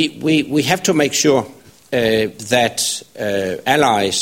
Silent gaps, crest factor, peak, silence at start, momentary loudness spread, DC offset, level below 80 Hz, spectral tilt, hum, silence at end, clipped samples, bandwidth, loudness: none; 16 dB; 0 dBFS; 0 s; 7 LU; under 0.1%; -52 dBFS; -3.5 dB/octave; none; 0 s; under 0.1%; 16.5 kHz; -16 LUFS